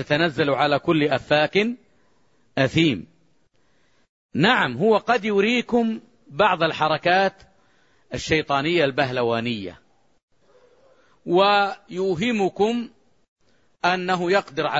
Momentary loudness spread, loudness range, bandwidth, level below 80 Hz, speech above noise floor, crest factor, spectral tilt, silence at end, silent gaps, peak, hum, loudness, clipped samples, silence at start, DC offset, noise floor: 12 LU; 4 LU; 8 kHz; -56 dBFS; 44 dB; 18 dB; -5.5 dB/octave; 0 s; 4.09-4.29 s, 10.23-10.28 s, 13.28-13.36 s; -4 dBFS; none; -21 LUFS; under 0.1%; 0 s; under 0.1%; -64 dBFS